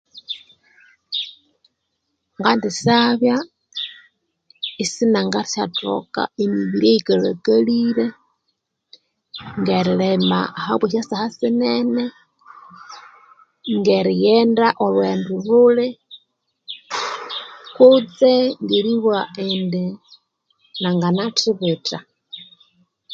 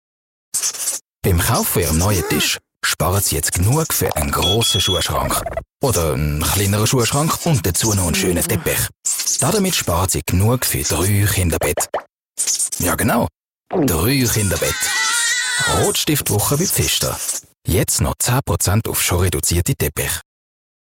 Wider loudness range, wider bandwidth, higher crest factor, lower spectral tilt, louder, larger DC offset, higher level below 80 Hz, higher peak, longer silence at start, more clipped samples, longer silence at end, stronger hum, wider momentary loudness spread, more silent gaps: first, 5 LU vs 2 LU; second, 9 kHz vs 16.5 kHz; first, 20 dB vs 12 dB; first, -5.5 dB/octave vs -3.5 dB/octave; about the same, -18 LUFS vs -17 LUFS; neither; second, -64 dBFS vs -36 dBFS; first, 0 dBFS vs -6 dBFS; second, 0.15 s vs 0.55 s; neither; second, 0 s vs 0.65 s; neither; first, 17 LU vs 5 LU; second, none vs 1.01-1.05 s, 12.12-12.16 s, 13.45-13.49 s, 13.60-13.64 s